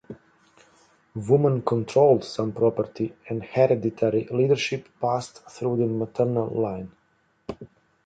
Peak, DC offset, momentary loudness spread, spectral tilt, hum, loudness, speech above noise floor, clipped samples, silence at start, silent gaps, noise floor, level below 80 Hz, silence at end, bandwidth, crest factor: -6 dBFS; under 0.1%; 20 LU; -7 dB/octave; none; -24 LUFS; 43 dB; under 0.1%; 0.1 s; none; -66 dBFS; -60 dBFS; 0.4 s; 9.2 kHz; 20 dB